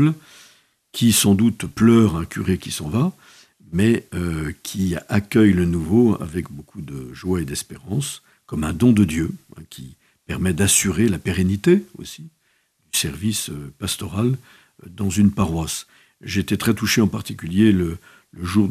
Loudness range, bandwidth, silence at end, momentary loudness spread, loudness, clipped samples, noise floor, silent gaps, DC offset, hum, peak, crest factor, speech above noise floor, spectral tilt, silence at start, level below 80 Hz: 4 LU; 15 kHz; 0 s; 17 LU; -20 LUFS; under 0.1%; -65 dBFS; none; under 0.1%; none; -2 dBFS; 18 dB; 45 dB; -5 dB/octave; 0 s; -44 dBFS